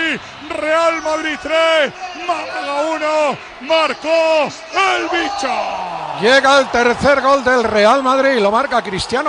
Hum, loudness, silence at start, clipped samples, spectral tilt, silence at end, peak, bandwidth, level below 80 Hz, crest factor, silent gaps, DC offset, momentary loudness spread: none; -15 LUFS; 0 s; under 0.1%; -3 dB/octave; 0 s; 0 dBFS; 10 kHz; -48 dBFS; 14 dB; none; under 0.1%; 9 LU